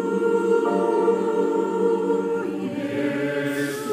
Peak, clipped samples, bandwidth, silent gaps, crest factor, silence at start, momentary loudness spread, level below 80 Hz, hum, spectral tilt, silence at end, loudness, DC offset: -8 dBFS; under 0.1%; 15.5 kHz; none; 14 dB; 0 s; 6 LU; -68 dBFS; none; -6.5 dB/octave; 0 s; -23 LUFS; under 0.1%